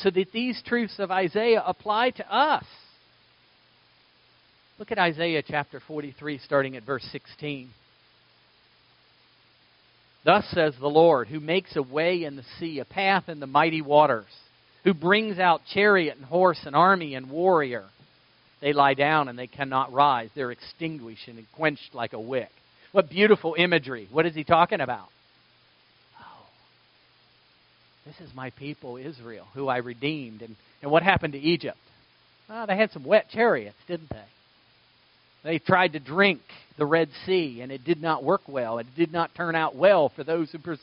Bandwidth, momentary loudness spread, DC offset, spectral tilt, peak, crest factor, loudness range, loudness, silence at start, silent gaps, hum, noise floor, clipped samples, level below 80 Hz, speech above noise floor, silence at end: 5.6 kHz; 16 LU; under 0.1%; -3 dB/octave; -2 dBFS; 24 dB; 10 LU; -24 LUFS; 0 s; none; none; -61 dBFS; under 0.1%; -64 dBFS; 36 dB; 0.05 s